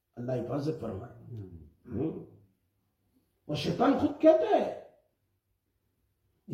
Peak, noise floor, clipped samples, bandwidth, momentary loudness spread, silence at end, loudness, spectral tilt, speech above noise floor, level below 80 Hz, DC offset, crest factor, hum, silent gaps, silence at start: -10 dBFS; -78 dBFS; under 0.1%; 12 kHz; 22 LU; 0 s; -29 LUFS; -7.5 dB/octave; 49 dB; -66 dBFS; under 0.1%; 22 dB; none; none; 0.15 s